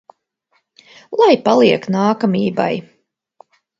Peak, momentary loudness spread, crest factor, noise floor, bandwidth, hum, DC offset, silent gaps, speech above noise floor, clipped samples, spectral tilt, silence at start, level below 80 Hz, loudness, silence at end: 0 dBFS; 10 LU; 18 dB; -65 dBFS; 7.8 kHz; none; under 0.1%; none; 51 dB; under 0.1%; -6.5 dB/octave; 1.1 s; -62 dBFS; -15 LUFS; 1 s